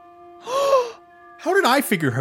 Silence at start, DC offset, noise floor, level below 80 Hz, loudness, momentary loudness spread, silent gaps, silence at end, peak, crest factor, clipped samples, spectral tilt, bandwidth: 0.2 s; under 0.1%; -45 dBFS; -68 dBFS; -20 LUFS; 13 LU; none; 0 s; -2 dBFS; 18 dB; under 0.1%; -4.5 dB/octave; 17 kHz